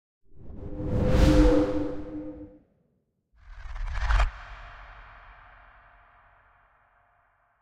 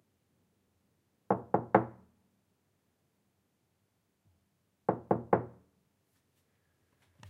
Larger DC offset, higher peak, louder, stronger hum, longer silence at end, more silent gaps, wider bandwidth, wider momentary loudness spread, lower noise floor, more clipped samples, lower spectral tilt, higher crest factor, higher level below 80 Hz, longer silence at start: neither; about the same, -8 dBFS vs -8 dBFS; first, -26 LUFS vs -32 LUFS; neither; first, 2.3 s vs 0 s; neither; first, 10.5 kHz vs 7.4 kHz; first, 27 LU vs 10 LU; second, -73 dBFS vs -78 dBFS; neither; second, -7 dB/octave vs -9.5 dB/octave; second, 20 dB vs 30 dB; first, -32 dBFS vs -74 dBFS; second, 0.35 s vs 1.3 s